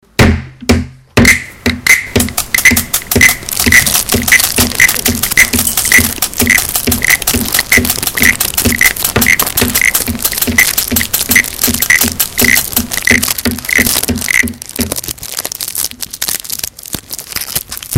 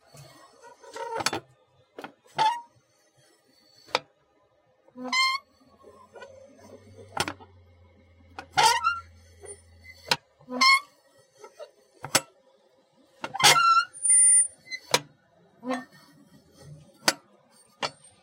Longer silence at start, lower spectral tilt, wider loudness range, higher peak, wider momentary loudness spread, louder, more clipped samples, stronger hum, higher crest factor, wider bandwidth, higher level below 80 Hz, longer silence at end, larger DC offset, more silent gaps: about the same, 0.2 s vs 0.2 s; first, -2 dB/octave vs 0 dB/octave; second, 6 LU vs 12 LU; first, 0 dBFS vs -6 dBFS; second, 10 LU vs 28 LU; first, -10 LUFS vs -23 LUFS; first, 1% vs under 0.1%; neither; second, 12 dB vs 24 dB; first, over 20 kHz vs 16 kHz; first, -28 dBFS vs -68 dBFS; second, 0 s vs 0.35 s; first, 0.5% vs under 0.1%; neither